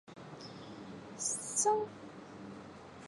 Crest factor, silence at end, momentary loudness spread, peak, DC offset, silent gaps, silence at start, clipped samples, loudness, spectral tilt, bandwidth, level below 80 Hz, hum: 20 dB; 0 s; 19 LU; -20 dBFS; under 0.1%; none; 0.05 s; under 0.1%; -34 LUFS; -2.5 dB/octave; 11.5 kHz; -74 dBFS; none